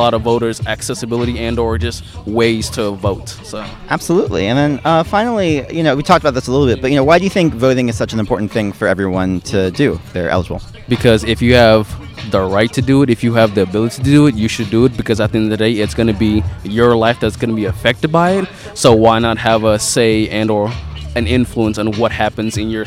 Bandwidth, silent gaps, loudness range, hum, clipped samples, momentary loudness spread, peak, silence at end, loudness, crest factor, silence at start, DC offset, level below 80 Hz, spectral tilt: 16 kHz; none; 4 LU; none; under 0.1%; 9 LU; 0 dBFS; 0 s; -14 LUFS; 14 dB; 0 s; under 0.1%; -34 dBFS; -5.5 dB/octave